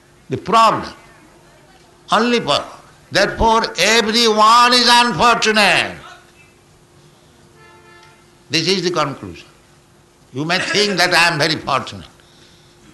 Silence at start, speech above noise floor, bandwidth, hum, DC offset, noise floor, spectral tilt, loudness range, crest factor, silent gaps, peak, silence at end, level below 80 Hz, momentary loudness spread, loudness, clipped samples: 0.3 s; 35 dB; 12.5 kHz; none; under 0.1%; -50 dBFS; -3 dB/octave; 11 LU; 16 dB; none; -2 dBFS; 0.85 s; -44 dBFS; 17 LU; -14 LUFS; under 0.1%